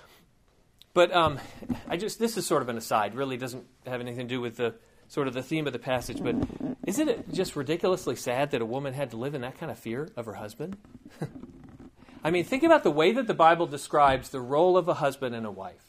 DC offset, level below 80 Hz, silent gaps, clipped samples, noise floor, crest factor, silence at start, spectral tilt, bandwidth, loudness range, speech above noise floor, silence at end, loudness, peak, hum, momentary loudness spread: under 0.1%; -56 dBFS; none; under 0.1%; -63 dBFS; 22 dB; 0.95 s; -5 dB/octave; 15.5 kHz; 10 LU; 36 dB; 0.15 s; -28 LUFS; -6 dBFS; none; 16 LU